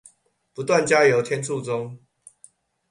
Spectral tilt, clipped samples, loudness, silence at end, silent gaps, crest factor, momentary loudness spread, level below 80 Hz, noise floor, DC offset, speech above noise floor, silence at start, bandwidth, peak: -4.5 dB/octave; under 0.1%; -21 LUFS; 0.95 s; none; 20 dB; 17 LU; -66 dBFS; -61 dBFS; under 0.1%; 40 dB; 0.6 s; 11.5 kHz; -4 dBFS